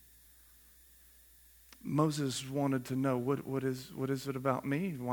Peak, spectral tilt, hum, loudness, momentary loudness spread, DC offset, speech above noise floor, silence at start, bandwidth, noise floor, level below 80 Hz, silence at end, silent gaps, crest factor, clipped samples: -14 dBFS; -6 dB/octave; none; -35 LUFS; 5 LU; under 0.1%; 27 dB; 1.85 s; 19.5 kHz; -61 dBFS; -68 dBFS; 0 s; none; 22 dB; under 0.1%